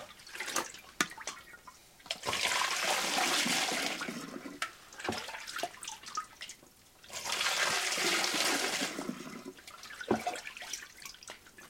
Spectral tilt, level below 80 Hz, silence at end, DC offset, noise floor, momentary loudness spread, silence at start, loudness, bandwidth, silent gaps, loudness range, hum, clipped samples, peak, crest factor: -1 dB/octave; -70 dBFS; 0 s; under 0.1%; -60 dBFS; 18 LU; 0 s; -33 LUFS; 16.5 kHz; none; 6 LU; none; under 0.1%; -14 dBFS; 22 dB